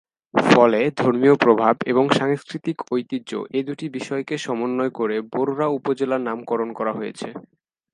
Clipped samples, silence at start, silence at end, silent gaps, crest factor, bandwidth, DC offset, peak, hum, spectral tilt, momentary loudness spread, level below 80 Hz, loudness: under 0.1%; 0.35 s; 0.55 s; none; 20 dB; 11.5 kHz; under 0.1%; 0 dBFS; none; -6 dB/octave; 13 LU; -68 dBFS; -21 LUFS